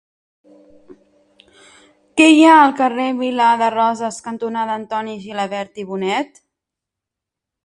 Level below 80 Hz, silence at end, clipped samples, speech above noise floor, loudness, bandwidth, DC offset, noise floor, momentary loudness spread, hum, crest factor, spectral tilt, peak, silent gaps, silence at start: -66 dBFS; 1.4 s; under 0.1%; 68 dB; -16 LUFS; 11.5 kHz; under 0.1%; -84 dBFS; 16 LU; none; 18 dB; -4 dB/octave; 0 dBFS; none; 2.15 s